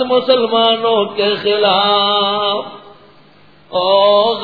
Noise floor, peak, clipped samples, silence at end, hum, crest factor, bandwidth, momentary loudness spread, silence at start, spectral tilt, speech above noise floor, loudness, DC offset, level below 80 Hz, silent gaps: -47 dBFS; 0 dBFS; under 0.1%; 0 s; none; 14 dB; 5 kHz; 7 LU; 0 s; -6 dB/octave; 33 dB; -13 LUFS; 0.3%; -62 dBFS; none